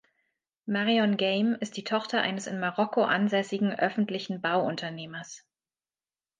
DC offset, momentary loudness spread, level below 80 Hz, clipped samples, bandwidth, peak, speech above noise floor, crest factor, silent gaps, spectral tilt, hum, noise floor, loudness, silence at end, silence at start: under 0.1%; 14 LU; -78 dBFS; under 0.1%; 9.4 kHz; -10 dBFS; over 62 dB; 20 dB; none; -5 dB/octave; none; under -90 dBFS; -28 LUFS; 1 s; 0.65 s